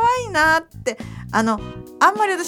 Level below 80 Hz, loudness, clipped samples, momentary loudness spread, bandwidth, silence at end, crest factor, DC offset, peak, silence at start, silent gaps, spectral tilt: -46 dBFS; -19 LUFS; under 0.1%; 12 LU; 18.5 kHz; 0 s; 18 dB; under 0.1%; -2 dBFS; 0 s; none; -4 dB/octave